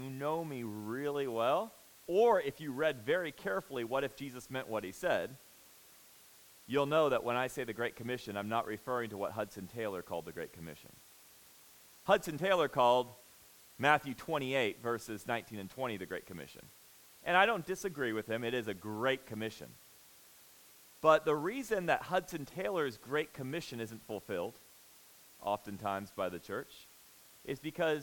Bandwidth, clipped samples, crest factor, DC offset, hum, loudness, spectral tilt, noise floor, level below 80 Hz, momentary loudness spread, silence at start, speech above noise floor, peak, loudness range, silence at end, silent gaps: 18 kHz; under 0.1%; 24 dB; under 0.1%; none; -35 LUFS; -4.5 dB/octave; -60 dBFS; -70 dBFS; 16 LU; 0 s; 25 dB; -12 dBFS; 7 LU; 0 s; none